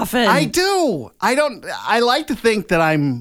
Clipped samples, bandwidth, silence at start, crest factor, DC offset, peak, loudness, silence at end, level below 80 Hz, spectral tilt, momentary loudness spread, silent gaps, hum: under 0.1%; 18 kHz; 0 s; 14 dB; under 0.1%; -4 dBFS; -17 LUFS; 0 s; -46 dBFS; -4.5 dB/octave; 6 LU; none; none